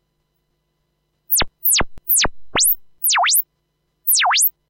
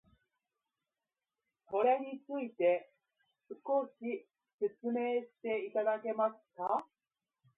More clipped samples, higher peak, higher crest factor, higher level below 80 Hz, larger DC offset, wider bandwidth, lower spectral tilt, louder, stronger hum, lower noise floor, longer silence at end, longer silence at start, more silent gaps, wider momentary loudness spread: neither; first, -4 dBFS vs -20 dBFS; about the same, 16 dB vs 18 dB; first, -40 dBFS vs -86 dBFS; neither; first, 16.5 kHz vs 3.9 kHz; about the same, 0.5 dB/octave vs 0 dB/octave; first, -16 LUFS vs -36 LUFS; first, 50 Hz at -60 dBFS vs none; second, -70 dBFS vs under -90 dBFS; second, 0.2 s vs 0.75 s; second, 1.3 s vs 1.7 s; second, none vs 4.53-4.58 s; second, 5 LU vs 10 LU